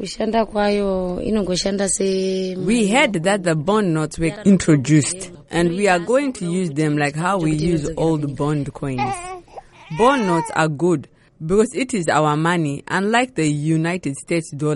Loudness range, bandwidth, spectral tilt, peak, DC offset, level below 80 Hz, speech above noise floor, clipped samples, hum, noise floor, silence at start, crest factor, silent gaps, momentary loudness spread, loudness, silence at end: 3 LU; 11.5 kHz; -5.5 dB/octave; -2 dBFS; under 0.1%; -44 dBFS; 22 dB; under 0.1%; none; -41 dBFS; 0 s; 16 dB; none; 8 LU; -19 LUFS; 0 s